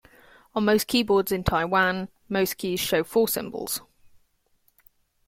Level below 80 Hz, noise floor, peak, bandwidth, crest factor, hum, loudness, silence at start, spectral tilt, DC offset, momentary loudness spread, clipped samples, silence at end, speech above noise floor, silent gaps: -48 dBFS; -67 dBFS; -6 dBFS; 16.5 kHz; 20 dB; none; -24 LUFS; 0.55 s; -4 dB/octave; under 0.1%; 9 LU; under 0.1%; 1.5 s; 43 dB; none